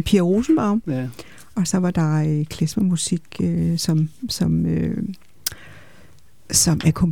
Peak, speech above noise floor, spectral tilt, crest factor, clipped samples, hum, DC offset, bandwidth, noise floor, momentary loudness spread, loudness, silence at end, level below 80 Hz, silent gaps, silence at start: -2 dBFS; 32 dB; -5 dB/octave; 20 dB; under 0.1%; none; 0.7%; 19.5 kHz; -52 dBFS; 11 LU; -21 LUFS; 0 s; -42 dBFS; none; 0 s